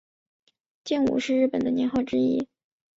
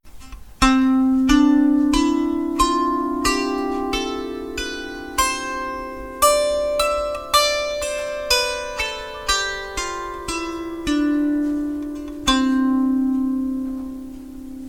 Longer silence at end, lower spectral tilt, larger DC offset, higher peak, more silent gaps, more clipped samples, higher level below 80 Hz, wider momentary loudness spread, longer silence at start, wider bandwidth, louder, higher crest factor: first, 0.5 s vs 0 s; first, -5.5 dB/octave vs -3 dB/octave; neither; second, -12 dBFS vs 0 dBFS; neither; neither; second, -62 dBFS vs -38 dBFS; second, 7 LU vs 12 LU; first, 0.85 s vs 0.05 s; second, 7.8 kHz vs 17.5 kHz; second, -25 LUFS vs -20 LUFS; second, 14 dB vs 20 dB